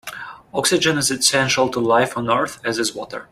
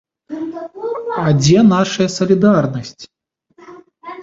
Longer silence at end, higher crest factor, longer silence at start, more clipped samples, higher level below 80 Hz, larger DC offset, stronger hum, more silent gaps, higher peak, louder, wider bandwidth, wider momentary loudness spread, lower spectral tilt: about the same, 0.05 s vs 0 s; about the same, 18 dB vs 14 dB; second, 0.05 s vs 0.3 s; neither; about the same, -54 dBFS vs -50 dBFS; neither; neither; neither; about the same, -2 dBFS vs -2 dBFS; second, -18 LUFS vs -15 LUFS; first, 16 kHz vs 8 kHz; second, 12 LU vs 21 LU; second, -2.5 dB/octave vs -6 dB/octave